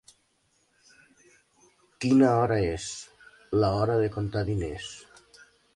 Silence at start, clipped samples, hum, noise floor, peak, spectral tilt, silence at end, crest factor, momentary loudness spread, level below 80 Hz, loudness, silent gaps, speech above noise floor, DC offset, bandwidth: 2 s; under 0.1%; none; -70 dBFS; -10 dBFS; -6.5 dB/octave; 0.75 s; 18 dB; 19 LU; -50 dBFS; -26 LUFS; none; 45 dB; under 0.1%; 11.5 kHz